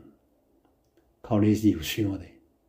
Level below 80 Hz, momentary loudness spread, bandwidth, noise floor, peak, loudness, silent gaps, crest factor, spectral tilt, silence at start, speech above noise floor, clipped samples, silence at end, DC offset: -56 dBFS; 9 LU; 16 kHz; -66 dBFS; -10 dBFS; -26 LUFS; none; 18 dB; -6.5 dB/octave; 1.25 s; 41 dB; under 0.1%; 0.4 s; under 0.1%